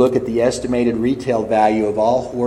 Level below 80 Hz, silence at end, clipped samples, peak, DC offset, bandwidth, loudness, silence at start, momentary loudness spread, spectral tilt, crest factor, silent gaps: -44 dBFS; 0 s; under 0.1%; -2 dBFS; under 0.1%; 12 kHz; -17 LUFS; 0 s; 3 LU; -6 dB/octave; 16 dB; none